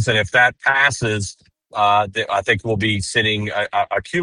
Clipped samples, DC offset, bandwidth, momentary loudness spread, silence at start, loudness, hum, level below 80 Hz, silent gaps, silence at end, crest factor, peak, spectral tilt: under 0.1%; under 0.1%; 11.5 kHz; 7 LU; 0 s; -18 LUFS; none; -48 dBFS; none; 0 s; 18 dB; 0 dBFS; -4 dB/octave